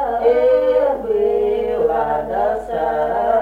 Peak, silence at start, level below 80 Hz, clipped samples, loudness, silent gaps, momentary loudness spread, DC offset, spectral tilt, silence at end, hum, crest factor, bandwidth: -4 dBFS; 0 s; -42 dBFS; under 0.1%; -17 LUFS; none; 6 LU; under 0.1%; -6.5 dB/octave; 0 s; 50 Hz at -40 dBFS; 14 dB; 4.9 kHz